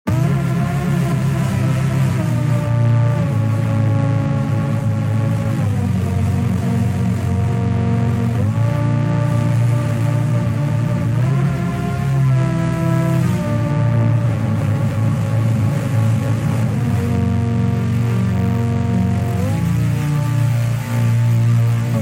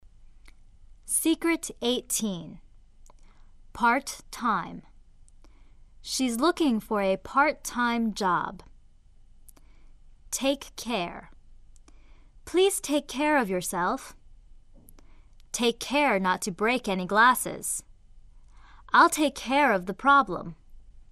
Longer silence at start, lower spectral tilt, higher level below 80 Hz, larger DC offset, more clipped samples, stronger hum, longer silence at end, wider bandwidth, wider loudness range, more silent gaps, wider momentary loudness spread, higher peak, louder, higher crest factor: about the same, 0.05 s vs 0.05 s; first, -8 dB/octave vs -3 dB/octave; first, -42 dBFS vs -52 dBFS; neither; neither; neither; about the same, 0 s vs 0.1 s; first, 15.5 kHz vs 14 kHz; second, 1 LU vs 7 LU; neither; second, 3 LU vs 15 LU; about the same, -6 dBFS vs -6 dBFS; first, -17 LUFS vs -26 LUFS; second, 10 dB vs 22 dB